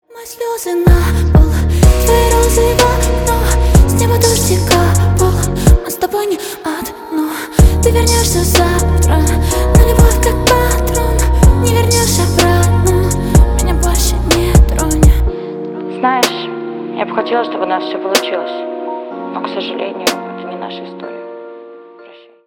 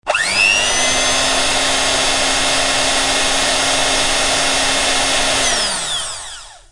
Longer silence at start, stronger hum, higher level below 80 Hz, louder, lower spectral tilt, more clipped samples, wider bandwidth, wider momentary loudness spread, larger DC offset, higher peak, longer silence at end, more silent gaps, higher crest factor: about the same, 0.15 s vs 0.05 s; neither; first, -16 dBFS vs -34 dBFS; about the same, -13 LUFS vs -13 LUFS; first, -5 dB/octave vs 0 dB/octave; neither; first, 18.5 kHz vs 12 kHz; first, 13 LU vs 6 LU; neither; about the same, 0 dBFS vs -2 dBFS; first, 0.45 s vs 0.15 s; neither; about the same, 12 dB vs 14 dB